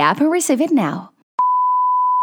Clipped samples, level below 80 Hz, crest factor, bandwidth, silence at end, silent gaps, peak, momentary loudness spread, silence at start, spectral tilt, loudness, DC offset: under 0.1%; -76 dBFS; 16 dB; 19 kHz; 0 s; 1.23-1.38 s; -2 dBFS; 9 LU; 0 s; -4.5 dB/octave; -17 LUFS; under 0.1%